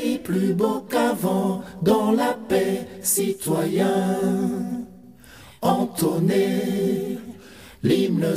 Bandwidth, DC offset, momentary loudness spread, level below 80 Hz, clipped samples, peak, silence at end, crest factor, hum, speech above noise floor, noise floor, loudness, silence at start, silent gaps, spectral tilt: 16 kHz; 0.1%; 8 LU; -56 dBFS; under 0.1%; -6 dBFS; 0 s; 16 dB; none; 25 dB; -46 dBFS; -22 LUFS; 0 s; none; -5.5 dB/octave